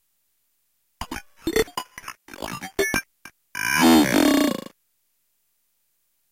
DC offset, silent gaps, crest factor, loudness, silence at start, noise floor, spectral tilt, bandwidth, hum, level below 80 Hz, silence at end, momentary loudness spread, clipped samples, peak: under 0.1%; none; 18 dB; -21 LUFS; 1 s; -71 dBFS; -3.5 dB/octave; 17 kHz; none; -48 dBFS; 1.75 s; 22 LU; under 0.1%; -8 dBFS